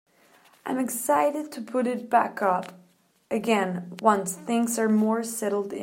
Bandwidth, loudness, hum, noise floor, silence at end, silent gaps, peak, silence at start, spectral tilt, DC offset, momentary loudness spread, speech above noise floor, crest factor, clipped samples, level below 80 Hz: 16.5 kHz; -25 LUFS; none; -58 dBFS; 0 s; none; -6 dBFS; 0.65 s; -4.5 dB/octave; under 0.1%; 8 LU; 33 dB; 20 dB; under 0.1%; -78 dBFS